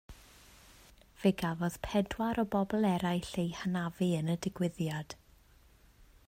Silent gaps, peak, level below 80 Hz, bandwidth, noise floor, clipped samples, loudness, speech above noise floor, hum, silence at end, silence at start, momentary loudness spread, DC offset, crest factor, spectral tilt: none; -16 dBFS; -58 dBFS; 16 kHz; -62 dBFS; under 0.1%; -33 LUFS; 30 dB; none; 0.25 s; 0.1 s; 6 LU; under 0.1%; 18 dB; -6.5 dB/octave